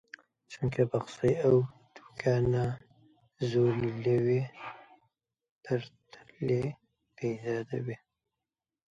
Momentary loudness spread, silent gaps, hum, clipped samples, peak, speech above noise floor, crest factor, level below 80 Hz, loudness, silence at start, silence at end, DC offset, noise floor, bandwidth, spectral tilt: 18 LU; 5.51-5.61 s; none; under 0.1%; -14 dBFS; over 61 dB; 18 dB; -60 dBFS; -31 LUFS; 0.5 s; 0.95 s; under 0.1%; under -90 dBFS; 8 kHz; -8 dB/octave